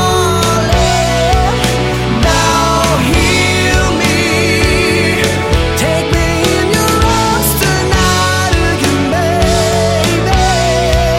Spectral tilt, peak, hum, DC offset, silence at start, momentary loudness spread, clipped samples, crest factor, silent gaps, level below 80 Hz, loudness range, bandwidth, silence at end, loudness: -4.5 dB/octave; 0 dBFS; none; under 0.1%; 0 s; 2 LU; under 0.1%; 10 dB; none; -20 dBFS; 1 LU; 16.5 kHz; 0 s; -11 LUFS